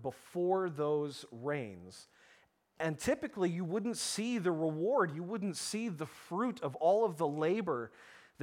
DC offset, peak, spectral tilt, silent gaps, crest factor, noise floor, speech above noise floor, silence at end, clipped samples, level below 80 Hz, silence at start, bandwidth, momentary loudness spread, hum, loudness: under 0.1%; -18 dBFS; -5 dB/octave; none; 16 dB; -68 dBFS; 33 dB; 0 s; under 0.1%; -72 dBFS; 0 s; 17 kHz; 10 LU; none; -35 LUFS